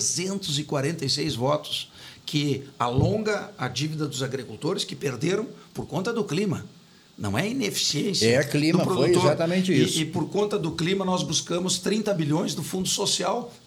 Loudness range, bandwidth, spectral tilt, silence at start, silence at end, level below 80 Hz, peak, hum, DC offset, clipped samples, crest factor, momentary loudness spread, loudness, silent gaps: 6 LU; 19 kHz; -4.5 dB/octave; 0 s; 0.1 s; -56 dBFS; -6 dBFS; none; under 0.1%; under 0.1%; 18 dB; 8 LU; -25 LUFS; none